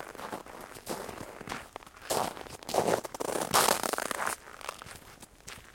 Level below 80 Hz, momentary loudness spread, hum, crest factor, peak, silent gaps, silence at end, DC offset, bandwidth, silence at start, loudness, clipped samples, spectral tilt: -60 dBFS; 20 LU; none; 26 dB; -8 dBFS; none; 0 s; under 0.1%; 17 kHz; 0 s; -32 LUFS; under 0.1%; -2 dB/octave